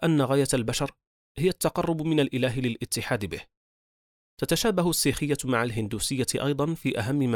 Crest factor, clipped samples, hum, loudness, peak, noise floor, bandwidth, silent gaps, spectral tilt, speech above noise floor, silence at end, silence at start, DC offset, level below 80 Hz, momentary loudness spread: 16 dB; under 0.1%; none; -26 LUFS; -10 dBFS; under -90 dBFS; 19.5 kHz; 1.07-1.35 s, 3.57-4.37 s; -5 dB/octave; over 64 dB; 0 s; 0 s; under 0.1%; -50 dBFS; 7 LU